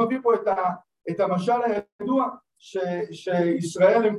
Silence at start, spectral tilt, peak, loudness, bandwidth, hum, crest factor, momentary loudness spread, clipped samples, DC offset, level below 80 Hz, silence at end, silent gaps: 0 s; -6.5 dB/octave; -6 dBFS; -24 LUFS; 12 kHz; none; 16 dB; 10 LU; under 0.1%; under 0.1%; -70 dBFS; 0 s; 1.92-1.99 s